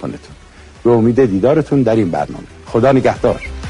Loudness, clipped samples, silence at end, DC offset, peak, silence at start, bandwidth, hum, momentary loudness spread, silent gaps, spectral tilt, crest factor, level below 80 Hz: -14 LUFS; under 0.1%; 0 s; under 0.1%; -2 dBFS; 0 s; 10.5 kHz; none; 13 LU; none; -8 dB/octave; 14 dB; -36 dBFS